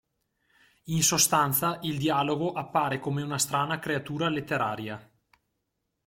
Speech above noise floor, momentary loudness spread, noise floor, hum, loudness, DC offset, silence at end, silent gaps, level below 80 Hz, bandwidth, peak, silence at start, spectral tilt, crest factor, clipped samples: 53 dB; 9 LU; -80 dBFS; none; -27 LUFS; under 0.1%; 1.05 s; none; -62 dBFS; 16.5 kHz; -10 dBFS; 0.85 s; -3.5 dB/octave; 20 dB; under 0.1%